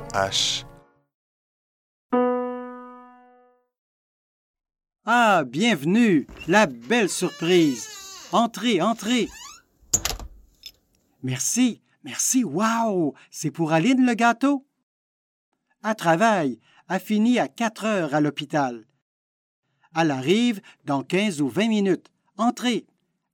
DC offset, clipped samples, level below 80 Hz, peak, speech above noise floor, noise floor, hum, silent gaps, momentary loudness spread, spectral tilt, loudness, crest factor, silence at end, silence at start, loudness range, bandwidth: under 0.1%; under 0.1%; -54 dBFS; -4 dBFS; 43 dB; -65 dBFS; none; 1.14-2.09 s, 3.78-4.54 s, 14.83-15.52 s, 19.02-19.63 s; 12 LU; -4 dB/octave; -23 LUFS; 20 dB; 0.55 s; 0 s; 6 LU; 17 kHz